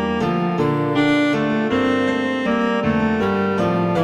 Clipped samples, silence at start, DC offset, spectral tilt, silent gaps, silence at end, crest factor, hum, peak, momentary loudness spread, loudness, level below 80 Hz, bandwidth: under 0.1%; 0 s; under 0.1%; -7 dB/octave; none; 0 s; 14 dB; none; -4 dBFS; 3 LU; -19 LUFS; -48 dBFS; 10.5 kHz